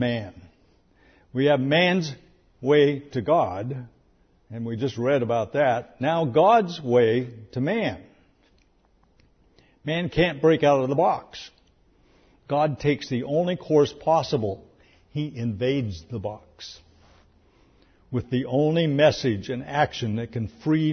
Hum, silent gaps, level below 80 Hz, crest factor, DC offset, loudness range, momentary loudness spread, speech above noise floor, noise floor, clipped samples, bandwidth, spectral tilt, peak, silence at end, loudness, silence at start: none; none; -54 dBFS; 18 dB; under 0.1%; 7 LU; 15 LU; 39 dB; -62 dBFS; under 0.1%; 6.6 kHz; -6.5 dB/octave; -6 dBFS; 0 s; -24 LUFS; 0 s